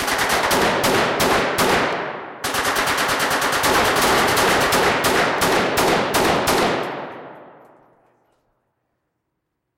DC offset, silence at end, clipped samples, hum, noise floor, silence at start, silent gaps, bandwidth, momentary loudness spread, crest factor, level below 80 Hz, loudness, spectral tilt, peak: under 0.1%; 2.3 s; under 0.1%; none; -76 dBFS; 0 s; none; 17 kHz; 9 LU; 14 dB; -44 dBFS; -18 LUFS; -2.5 dB/octave; -6 dBFS